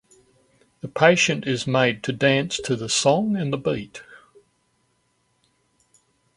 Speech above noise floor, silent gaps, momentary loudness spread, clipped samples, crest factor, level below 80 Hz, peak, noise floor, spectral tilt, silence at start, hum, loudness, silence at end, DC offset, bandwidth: 47 dB; none; 15 LU; under 0.1%; 24 dB; -60 dBFS; 0 dBFS; -68 dBFS; -4 dB/octave; 0.85 s; none; -21 LUFS; 2.2 s; under 0.1%; 11.5 kHz